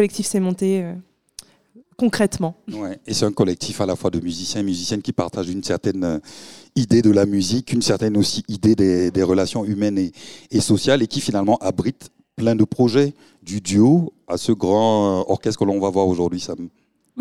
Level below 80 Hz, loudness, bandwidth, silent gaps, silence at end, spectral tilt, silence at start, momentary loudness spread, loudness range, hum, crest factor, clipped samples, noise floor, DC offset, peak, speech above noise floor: -52 dBFS; -20 LUFS; 15.5 kHz; none; 0 s; -5.5 dB/octave; 0 s; 12 LU; 5 LU; none; 16 dB; under 0.1%; -52 dBFS; 0.3%; -4 dBFS; 33 dB